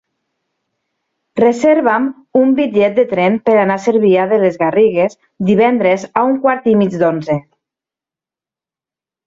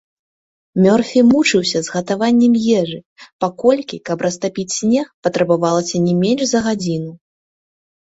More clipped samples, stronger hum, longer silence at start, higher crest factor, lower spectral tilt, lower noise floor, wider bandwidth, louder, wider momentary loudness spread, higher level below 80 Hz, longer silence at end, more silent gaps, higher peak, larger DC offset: neither; neither; first, 1.35 s vs 0.75 s; about the same, 12 dB vs 14 dB; first, -7 dB/octave vs -5 dB/octave; about the same, -89 dBFS vs under -90 dBFS; about the same, 7.8 kHz vs 8 kHz; first, -13 LUFS vs -16 LUFS; second, 5 LU vs 11 LU; about the same, -58 dBFS vs -56 dBFS; first, 1.85 s vs 0.9 s; second, none vs 3.06-3.16 s, 3.33-3.39 s, 5.14-5.23 s; about the same, -2 dBFS vs -2 dBFS; neither